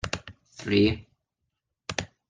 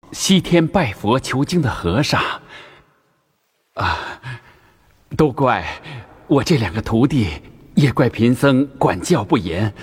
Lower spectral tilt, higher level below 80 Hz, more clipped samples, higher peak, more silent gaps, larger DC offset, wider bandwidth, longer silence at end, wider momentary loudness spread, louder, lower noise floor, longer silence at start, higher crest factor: about the same, -5 dB/octave vs -5.5 dB/octave; second, -52 dBFS vs -40 dBFS; neither; second, -8 dBFS vs -2 dBFS; neither; neither; second, 9.6 kHz vs 16 kHz; first, 0.25 s vs 0 s; about the same, 17 LU vs 16 LU; second, -27 LUFS vs -18 LUFS; first, -82 dBFS vs -66 dBFS; about the same, 0.05 s vs 0.1 s; first, 22 dB vs 16 dB